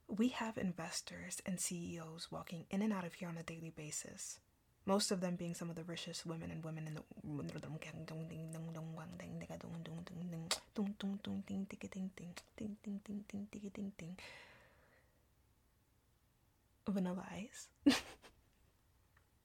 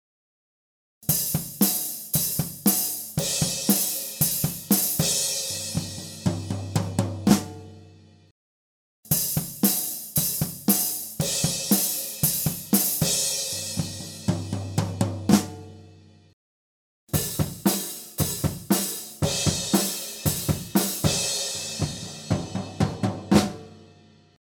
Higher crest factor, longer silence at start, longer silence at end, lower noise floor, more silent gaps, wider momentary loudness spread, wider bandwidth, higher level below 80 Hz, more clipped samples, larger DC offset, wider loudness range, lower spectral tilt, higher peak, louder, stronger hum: about the same, 26 dB vs 22 dB; second, 0.1 s vs 1 s; first, 1.15 s vs 0.7 s; first, -75 dBFS vs -54 dBFS; second, none vs 8.31-9.03 s, 16.33-17.07 s; first, 12 LU vs 8 LU; second, 18 kHz vs over 20 kHz; second, -72 dBFS vs -50 dBFS; neither; neither; first, 8 LU vs 5 LU; about the same, -4.5 dB/octave vs -3.5 dB/octave; second, -20 dBFS vs -4 dBFS; second, -44 LUFS vs -24 LUFS; neither